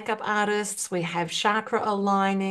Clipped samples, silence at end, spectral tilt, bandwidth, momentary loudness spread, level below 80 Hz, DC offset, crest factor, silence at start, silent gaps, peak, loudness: under 0.1%; 0 s; -4 dB/octave; 12.5 kHz; 4 LU; -72 dBFS; under 0.1%; 18 dB; 0 s; none; -8 dBFS; -25 LUFS